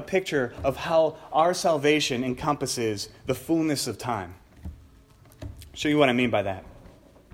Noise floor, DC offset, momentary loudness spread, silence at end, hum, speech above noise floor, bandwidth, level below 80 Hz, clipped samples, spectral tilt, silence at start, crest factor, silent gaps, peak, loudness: -53 dBFS; under 0.1%; 21 LU; 0.55 s; none; 28 dB; 16.5 kHz; -50 dBFS; under 0.1%; -4.5 dB/octave; 0 s; 20 dB; none; -6 dBFS; -25 LUFS